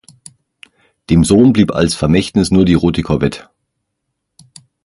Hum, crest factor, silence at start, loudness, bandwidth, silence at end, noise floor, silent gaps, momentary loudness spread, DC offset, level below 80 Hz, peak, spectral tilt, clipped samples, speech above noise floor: none; 14 dB; 1.1 s; -12 LUFS; 11.5 kHz; 1.45 s; -73 dBFS; none; 7 LU; under 0.1%; -32 dBFS; 0 dBFS; -6.5 dB/octave; under 0.1%; 61 dB